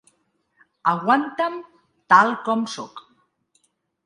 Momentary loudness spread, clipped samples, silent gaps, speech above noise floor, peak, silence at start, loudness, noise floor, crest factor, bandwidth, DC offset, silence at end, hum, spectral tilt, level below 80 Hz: 18 LU; under 0.1%; none; 48 dB; 0 dBFS; 0.85 s; -20 LUFS; -68 dBFS; 22 dB; 11.5 kHz; under 0.1%; 1.05 s; none; -5 dB/octave; -74 dBFS